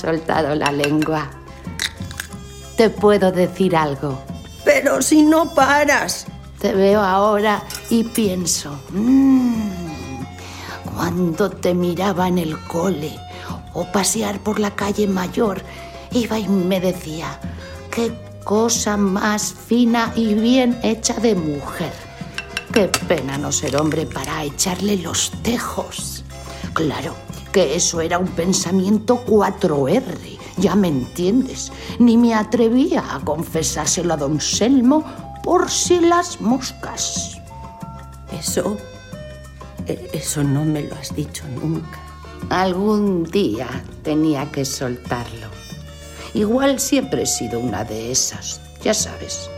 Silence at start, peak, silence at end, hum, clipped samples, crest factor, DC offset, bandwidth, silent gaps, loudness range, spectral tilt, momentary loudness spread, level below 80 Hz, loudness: 0 s; 0 dBFS; 0 s; none; under 0.1%; 18 dB; under 0.1%; 16.5 kHz; none; 6 LU; -4.5 dB/octave; 17 LU; -42 dBFS; -19 LUFS